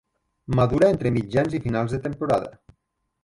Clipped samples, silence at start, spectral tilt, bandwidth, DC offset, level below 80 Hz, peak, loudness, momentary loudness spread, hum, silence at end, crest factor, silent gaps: under 0.1%; 0.5 s; -8 dB/octave; 11.5 kHz; under 0.1%; -44 dBFS; -6 dBFS; -23 LUFS; 8 LU; none; 0.75 s; 18 dB; none